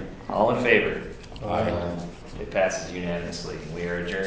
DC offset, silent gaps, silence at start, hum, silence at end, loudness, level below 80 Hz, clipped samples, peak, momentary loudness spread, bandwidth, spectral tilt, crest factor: under 0.1%; none; 0 s; none; 0 s; -26 LUFS; -44 dBFS; under 0.1%; -2 dBFS; 15 LU; 8 kHz; -5 dB/octave; 24 dB